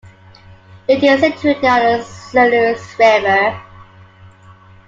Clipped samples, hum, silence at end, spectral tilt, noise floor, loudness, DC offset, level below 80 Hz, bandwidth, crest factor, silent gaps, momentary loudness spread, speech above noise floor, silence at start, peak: under 0.1%; none; 1.25 s; -5 dB/octave; -42 dBFS; -13 LUFS; under 0.1%; -52 dBFS; 7.8 kHz; 14 dB; none; 8 LU; 30 dB; 0.9 s; -2 dBFS